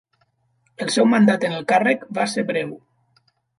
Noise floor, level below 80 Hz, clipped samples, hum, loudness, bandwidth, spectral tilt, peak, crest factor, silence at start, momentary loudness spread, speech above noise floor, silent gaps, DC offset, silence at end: -66 dBFS; -70 dBFS; under 0.1%; none; -19 LUFS; 11.5 kHz; -5 dB/octave; -4 dBFS; 18 dB; 0.8 s; 11 LU; 47 dB; none; under 0.1%; 0.8 s